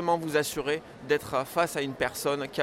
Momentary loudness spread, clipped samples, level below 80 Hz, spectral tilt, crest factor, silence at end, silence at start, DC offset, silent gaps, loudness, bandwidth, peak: 4 LU; under 0.1%; -58 dBFS; -4 dB/octave; 16 dB; 0 s; 0 s; under 0.1%; none; -29 LUFS; 16.5 kHz; -12 dBFS